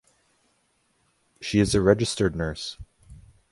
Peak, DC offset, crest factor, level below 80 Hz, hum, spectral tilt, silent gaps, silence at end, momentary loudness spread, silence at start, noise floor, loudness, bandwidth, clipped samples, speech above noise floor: -4 dBFS; under 0.1%; 22 dB; -44 dBFS; none; -5.5 dB/octave; none; 0.35 s; 16 LU; 1.4 s; -69 dBFS; -24 LUFS; 11.5 kHz; under 0.1%; 46 dB